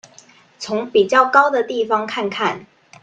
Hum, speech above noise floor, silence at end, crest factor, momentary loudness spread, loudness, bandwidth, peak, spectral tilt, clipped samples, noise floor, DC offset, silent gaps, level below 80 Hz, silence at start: none; 31 dB; 0.4 s; 18 dB; 12 LU; -17 LUFS; 9 kHz; 0 dBFS; -4 dB/octave; under 0.1%; -48 dBFS; under 0.1%; none; -66 dBFS; 0.6 s